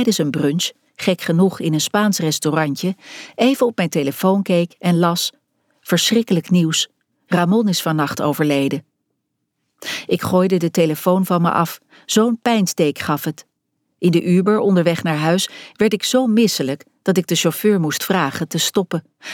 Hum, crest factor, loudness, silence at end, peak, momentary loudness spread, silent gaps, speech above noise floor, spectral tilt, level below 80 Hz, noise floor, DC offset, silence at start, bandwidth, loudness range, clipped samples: none; 14 dB; -18 LUFS; 0 s; -2 dBFS; 8 LU; none; 56 dB; -5 dB/octave; -64 dBFS; -74 dBFS; under 0.1%; 0 s; 18.5 kHz; 2 LU; under 0.1%